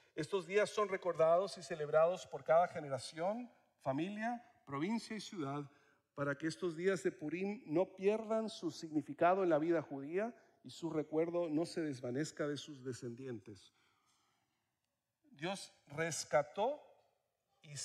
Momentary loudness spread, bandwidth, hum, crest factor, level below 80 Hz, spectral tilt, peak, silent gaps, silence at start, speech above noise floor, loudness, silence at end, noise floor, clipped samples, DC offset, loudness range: 14 LU; 13 kHz; none; 20 dB; -84 dBFS; -5 dB/octave; -20 dBFS; none; 0.15 s; 51 dB; -38 LUFS; 0 s; -89 dBFS; under 0.1%; under 0.1%; 10 LU